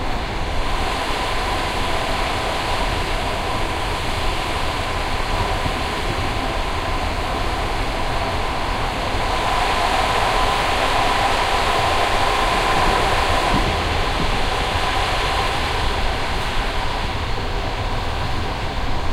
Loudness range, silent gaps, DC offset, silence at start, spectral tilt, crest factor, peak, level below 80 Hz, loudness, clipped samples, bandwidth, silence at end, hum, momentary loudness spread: 5 LU; none; under 0.1%; 0 s; -4 dB/octave; 14 dB; -6 dBFS; -26 dBFS; -21 LUFS; under 0.1%; 16 kHz; 0 s; none; 6 LU